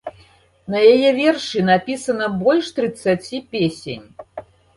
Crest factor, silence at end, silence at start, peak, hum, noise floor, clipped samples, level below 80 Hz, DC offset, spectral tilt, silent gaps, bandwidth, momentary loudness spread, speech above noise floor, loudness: 16 dB; 0.35 s; 0.05 s; -2 dBFS; none; -52 dBFS; under 0.1%; -56 dBFS; under 0.1%; -5.5 dB/octave; none; 11.5 kHz; 23 LU; 34 dB; -18 LUFS